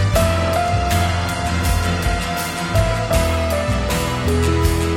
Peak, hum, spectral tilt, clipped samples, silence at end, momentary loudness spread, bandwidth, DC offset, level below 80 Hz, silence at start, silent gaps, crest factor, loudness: -4 dBFS; none; -5 dB/octave; under 0.1%; 0 s; 3 LU; 17.5 kHz; under 0.1%; -24 dBFS; 0 s; none; 14 dB; -19 LUFS